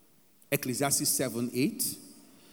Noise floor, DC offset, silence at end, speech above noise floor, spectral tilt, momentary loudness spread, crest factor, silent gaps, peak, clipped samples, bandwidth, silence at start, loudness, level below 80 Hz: -63 dBFS; under 0.1%; 0.35 s; 33 dB; -3 dB/octave; 7 LU; 20 dB; none; -12 dBFS; under 0.1%; over 20 kHz; 0.5 s; -29 LUFS; -72 dBFS